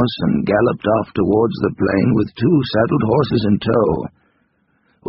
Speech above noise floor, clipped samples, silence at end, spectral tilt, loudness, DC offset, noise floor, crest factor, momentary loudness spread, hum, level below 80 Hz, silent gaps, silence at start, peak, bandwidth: 46 dB; under 0.1%; 0 s; -6.5 dB/octave; -17 LUFS; under 0.1%; -62 dBFS; 14 dB; 3 LU; none; -44 dBFS; none; 0 s; -2 dBFS; 5.8 kHz